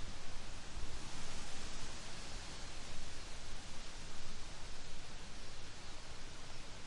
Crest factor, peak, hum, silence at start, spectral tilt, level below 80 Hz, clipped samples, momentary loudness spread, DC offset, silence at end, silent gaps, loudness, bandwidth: 12 dB; -26 dBFS; none; 0 s; -3 dB/octave; -48 dBFS; under 0.1%; 4 LU; under 0.1%; 0 s; none; -50 LUFS; 11 kHz